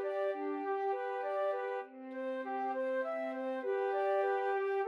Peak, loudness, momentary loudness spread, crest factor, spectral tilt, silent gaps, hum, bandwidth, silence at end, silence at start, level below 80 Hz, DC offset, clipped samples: -24 dBFS; -36 LUFS; 7 LU; 12 dB; -4 dB/octave; none; none; 5.8 kHz; 0 s; 0 s; under -90 dBFS; under 0.1%; under 0.1%